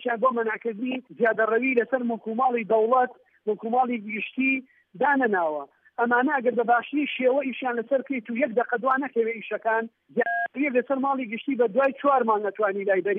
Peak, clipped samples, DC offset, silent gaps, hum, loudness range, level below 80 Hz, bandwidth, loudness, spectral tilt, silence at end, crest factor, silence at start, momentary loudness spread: -10 dBFS; under 0.1%; under 0.1%; none; none; 2 LU; -84 dBFS; 3.8 kHz; -25 LUFS; -8.5 dB/octave; 0 s; 16 dB; 0 s; 8 LU